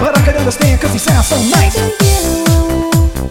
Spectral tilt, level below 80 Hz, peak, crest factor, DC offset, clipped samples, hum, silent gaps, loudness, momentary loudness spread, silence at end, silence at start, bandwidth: -5 dB/octave; -18 dBFS; 0 dBFS; 10 dB; under 0.1%; under 0.1%; none; none; -11 LUFS; 2 LU; 0 s; 0 s; 17 kHz